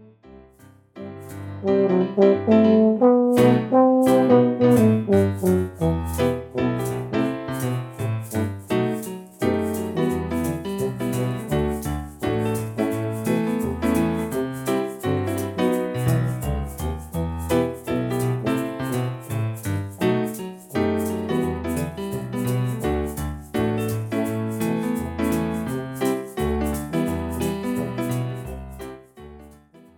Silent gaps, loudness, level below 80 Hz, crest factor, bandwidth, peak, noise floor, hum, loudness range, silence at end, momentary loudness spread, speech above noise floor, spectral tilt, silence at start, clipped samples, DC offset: none; -23 LUFS; -40 dBFS; 18 dB; 18 kHz; -4 dBFS; -51 dBFS; none; 8 LU; 0.4 s; 12 LU; 34 dB; -7 dB/octave; 0 s; under 0.1%; under 0.1%